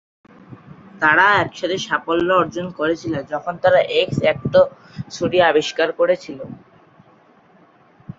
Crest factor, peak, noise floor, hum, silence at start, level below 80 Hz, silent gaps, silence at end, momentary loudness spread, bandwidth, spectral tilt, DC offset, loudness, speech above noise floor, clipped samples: 18 dB; 0 dBFS; -52 dBFS; none; 0.5 s; -54 dBFS; none; 0.05 s; 11 LU; 7.8 kHz; -5 dB/octave; under 0.1%; -18 LUFS; 34 dB; under 0.1%